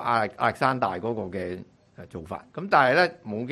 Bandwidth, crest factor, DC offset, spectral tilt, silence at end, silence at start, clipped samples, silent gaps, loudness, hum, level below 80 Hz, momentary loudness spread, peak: 13 kHz; 22 dB; under 0.1%; -6 dB/octave; 0 s; 0 s; under 0.1%; none; -25 LUFS; none; -56 dBFS; 17 LU; -4 dBFS